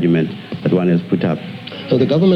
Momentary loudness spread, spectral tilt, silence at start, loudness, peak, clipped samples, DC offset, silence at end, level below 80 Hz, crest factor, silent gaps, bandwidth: 10 LU; -9 dB/octave; 0 s; -17 LUFS; -2 dBFS; under 0.1%; under 0.1%; 0 s; -58 dBFS; 14 dB; none; 6 kHz